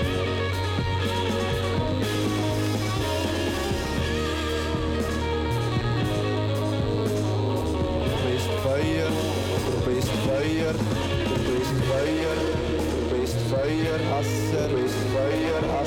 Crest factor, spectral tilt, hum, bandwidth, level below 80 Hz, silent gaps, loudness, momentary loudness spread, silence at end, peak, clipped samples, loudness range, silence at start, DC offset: 14 dB; -6 dB/octave; none; 17.5 kHz; -38 dBFS; none; -25 LUFS; 2 LU; 0 s; -12 dBFS; under 0.1%; 1 LU; 0 s; under 0.1%